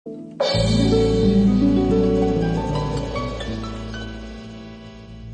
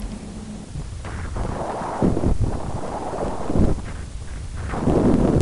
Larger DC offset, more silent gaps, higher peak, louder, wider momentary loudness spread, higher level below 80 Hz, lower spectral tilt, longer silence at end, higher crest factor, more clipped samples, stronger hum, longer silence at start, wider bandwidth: neither; neither; about the same, -6 dBFS vs -6 dBFS; first, -20 LUFS vs -25 LUFS; first, 20 LU vs 16 LU; about the same, -32 dBFS vs -28 dBFS; about the same, -7 dB/octave vs -7.5 dB/octave; about the same, 0 s vs 0 s; about the same, 14 dB vs 16 dB; neither; neither; about the same, 0.05 s vs 0 s; second, 9.8 kHz vs 11 kHz